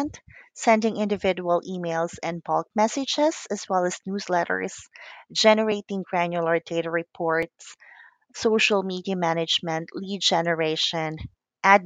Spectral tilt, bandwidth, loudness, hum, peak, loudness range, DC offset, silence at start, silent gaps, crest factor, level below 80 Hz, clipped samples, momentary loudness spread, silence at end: -4 dB/octave; 9.4 kHz; -24 LUFS; none; -2 dBFS; 2 LU; under 0.1%; 0 s; none; 24 dB; -60 dBFS; under 0.1%; 12 LU; 0 s